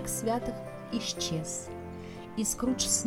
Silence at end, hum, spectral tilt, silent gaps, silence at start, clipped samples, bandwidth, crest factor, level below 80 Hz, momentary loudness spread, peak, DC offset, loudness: 0 s; none; -3 dB/octave; none; 0 s; under 0.1%; 18.5 kHz; 20 dB; -52 dBFS; 12 LU; -14 dBFS; under 0.1%; -33 LUFS